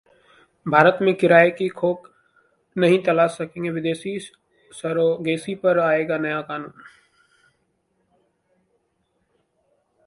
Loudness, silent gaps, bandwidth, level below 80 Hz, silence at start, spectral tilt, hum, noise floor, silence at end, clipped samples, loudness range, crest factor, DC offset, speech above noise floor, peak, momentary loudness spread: -20 LUFS; none; 11.5 kHz; -66 dBFS; 0.65 s; -6.5 dB/octave; none; -70 dBFS; 3.4 s; under 0.1%; 10 LU; 22 dB; under 0.1%; 50 dB; 0 dBFS; 17 LU